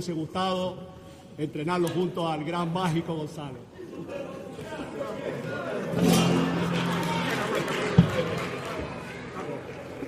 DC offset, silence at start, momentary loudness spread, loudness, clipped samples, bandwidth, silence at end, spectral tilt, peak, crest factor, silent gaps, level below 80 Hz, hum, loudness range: under 0.1%; 0 s; 16 LU; -28 LUFS; under 0.1%; 15.5 kHz; 0 s; -6 dB/octave; -4 dBFS; 24 dB; none; -56 dBFS; none; 7 LU